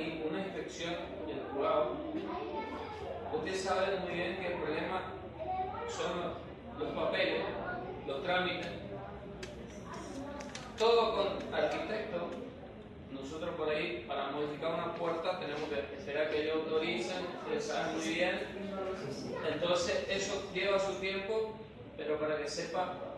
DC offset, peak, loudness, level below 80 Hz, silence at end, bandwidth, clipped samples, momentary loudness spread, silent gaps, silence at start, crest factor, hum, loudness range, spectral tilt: under 0.1%; -18 dBFS; -36 LUFS; -60 dBFS; 0 s; 12 kHz; under 0.1%; 12 LU; none; 0 s; 20 dB; none; 3 LU; -4.5 dB/octave